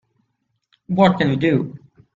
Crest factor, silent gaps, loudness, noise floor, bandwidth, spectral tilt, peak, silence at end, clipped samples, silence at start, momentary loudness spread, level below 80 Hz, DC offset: 20 dB; none; -18 LUFS; -72 dBFS; 7.6 kHz; -8 dB/octave; 0 dBFS; 0.4 s; under 0.1%; 0.9 s; 10 LU; -54 dBFS; under 0.1%